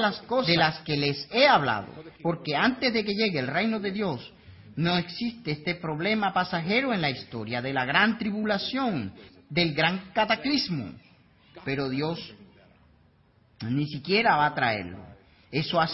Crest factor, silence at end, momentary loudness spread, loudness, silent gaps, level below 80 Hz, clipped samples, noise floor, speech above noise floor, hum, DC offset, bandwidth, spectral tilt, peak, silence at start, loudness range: 22 dB; 0 s; 12 LU; -26 LUFS; none; -60 dBFS; under 0.1%; -61 dBFS; 35 dB; none; under 0.1%; 6 kHz; -8 dB/octave; -6 dBFS; 0 s; 5 LU